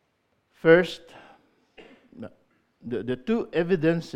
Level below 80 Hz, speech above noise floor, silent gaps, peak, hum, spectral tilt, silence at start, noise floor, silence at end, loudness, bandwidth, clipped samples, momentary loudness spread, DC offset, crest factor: -60 dBFS; 48 dB; none; -4 dBFS; none; -7 dB/octave; 0.65 s; -71 dBFS; 0.05 s; -24 LUFS; 9.8 kHz; under 0.1%; 25 LU; under 0.1%; 22 dB